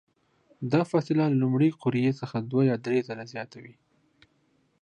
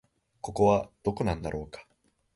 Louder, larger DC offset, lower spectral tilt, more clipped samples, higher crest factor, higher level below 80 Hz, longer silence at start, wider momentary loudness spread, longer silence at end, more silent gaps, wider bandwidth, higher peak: first, -26 LUFS vs -29 LUFS; neither; first, -8.5 dB/octave vs -7 dB/octave; neither; about the same, 20 dB vs 20 dB; second, -72 dBFS vs -48 dBFS; first, 0.6 s vs 0.45 s; second, 14 LU vs 19 LU; first, 1.1 s vs 0.55 s; neither; second, 9.6 kHz vs 11.5 kHz; about the same, -8 dBFS vs -10 dBFS